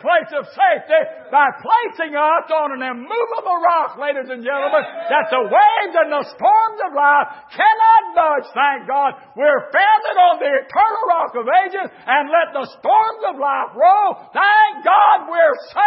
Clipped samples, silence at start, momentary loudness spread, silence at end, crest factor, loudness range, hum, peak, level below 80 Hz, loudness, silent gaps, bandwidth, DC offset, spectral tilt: under 0.1%; 0 s; 9 LU; 0 s; 14 dB; 3 LU; none; -2 dBFS; -72 dBFS; -16 LUFS; none; 5.8 kHz; under 0.1%; -7 dB/octave